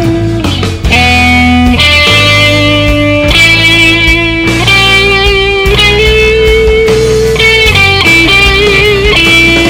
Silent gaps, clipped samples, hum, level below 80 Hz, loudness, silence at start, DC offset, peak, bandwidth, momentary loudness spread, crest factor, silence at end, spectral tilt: none; 7%; none; -16 dBFS; -4 LUFS; 0 s; under 0.1%; 0 dBFS; over 20 kHz; 5 LU; 6 dB; 0 s; -4 dB/octave